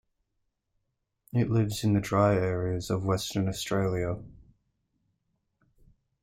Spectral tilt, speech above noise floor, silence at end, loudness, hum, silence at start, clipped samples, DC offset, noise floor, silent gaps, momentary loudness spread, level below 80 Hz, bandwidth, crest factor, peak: -6.5 dB/octave; 53 dB; 1.9 s; -28 LUFS; none; 1.35 s; under 0.1%; under 0.1%; -80 dBFS; none; 8 LU; -54 dBFS; 16 kHz; 18 dB; -12 dBFS